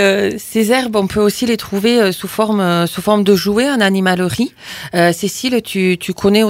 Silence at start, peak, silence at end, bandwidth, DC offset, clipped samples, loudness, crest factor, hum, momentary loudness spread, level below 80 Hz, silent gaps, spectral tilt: 0 s; 0 dBFS; 0 s; 16.5 kHz; under 0.1%; under 0.1%; -15 LUFS; 14 dB; none; 5 LU; -46 dBFS; none; -5 dB/octave